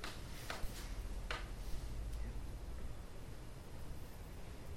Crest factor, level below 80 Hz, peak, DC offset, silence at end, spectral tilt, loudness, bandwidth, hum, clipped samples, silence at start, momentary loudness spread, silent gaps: 20 dB; -48 dBFS; -24 dBFS; under 0.1%; 0 s; -4.5 dB/octave; -49 LUFS; 16.5 kHz; none; under 0.1%; 0 s; 7 LU; none